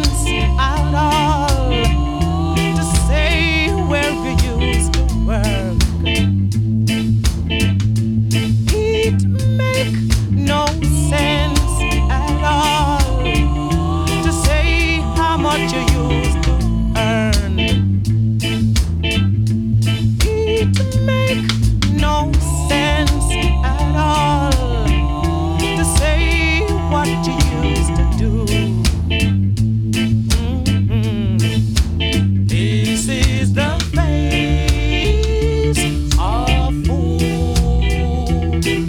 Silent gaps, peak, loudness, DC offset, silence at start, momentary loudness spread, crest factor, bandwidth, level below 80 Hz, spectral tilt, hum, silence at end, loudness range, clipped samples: none; 0 dBFS; -16 LUFS; under 0.1%; 0 s; 3 LU; 14 dB; 17 kHz; -20 dBFS; -5.5 dB/octave; none; 0 s; 1 LU; under 0.1%